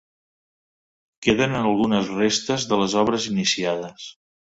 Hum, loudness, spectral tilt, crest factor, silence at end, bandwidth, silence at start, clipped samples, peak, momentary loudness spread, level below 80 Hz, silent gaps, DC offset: none; -21 LUFS; -4 dB/octave; 20 dB; 0.3 s; 8 kHz; 1.2 s; under 0.1%; -2 dBFS; 9 LU; -54 dBFS; none; under 0.1%